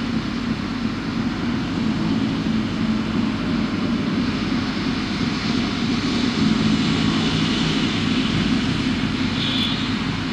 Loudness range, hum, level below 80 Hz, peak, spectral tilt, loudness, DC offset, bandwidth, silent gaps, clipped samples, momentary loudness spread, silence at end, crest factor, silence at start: 3 LU; none; -40 dBFS; -8 dBFS; -5.5 dB/octave; -21 LUFS; under 0.1%; 10.5 kHz; none; under 0.1%; 5 LU; 0 s; 14 dB; 0 s